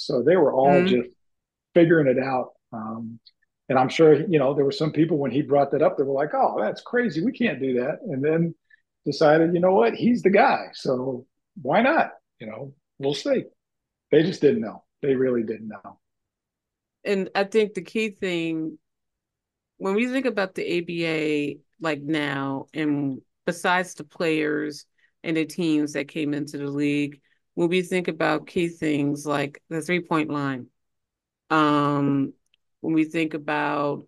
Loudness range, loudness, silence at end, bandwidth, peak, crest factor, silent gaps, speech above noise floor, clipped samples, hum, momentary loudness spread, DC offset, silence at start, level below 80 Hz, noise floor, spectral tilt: 6 LU; -23 LUFS; 0.05 s; 12.5 kHz; -4 dBFS; 20 dB; none; 63 dB; under 0.1%; none; 14 LU; under 0.1%; 0 s; -68 dBFS; -85 dBFS; -6.5 dB/octave